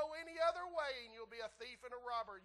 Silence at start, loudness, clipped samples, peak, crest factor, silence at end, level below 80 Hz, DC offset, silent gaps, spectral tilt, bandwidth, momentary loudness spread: 0 s; -44 LUFS; under 0.1%; -26 dBFS; 18 dB; 0 s; -74 dBFS; under 0.1%; none; -2.5 dB/octave; 12 kHz; 12 LU